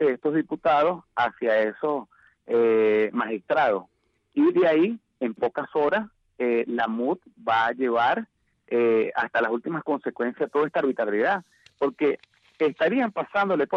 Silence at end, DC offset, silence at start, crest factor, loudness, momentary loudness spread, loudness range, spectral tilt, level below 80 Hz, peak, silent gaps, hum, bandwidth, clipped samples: 0 s; under 0.1%; 0 s; 10 dB; -24 LUFS; 8 LU; 2 LU; -7.5 dB/octave; -68 dBFS; -14 dBFS; none; none; 6.2 kHz; under 0.1%